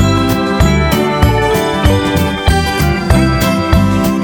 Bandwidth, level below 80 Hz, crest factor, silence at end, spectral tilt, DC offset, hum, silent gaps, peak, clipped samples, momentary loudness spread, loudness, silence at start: over 20 kHz; -20 dBFS; 12 dB; 0 s; -6 dB/octave; under 0.1%; none; none; 0 dBFS; under 0.1%; 2 LU; -12 LUFS; 0 s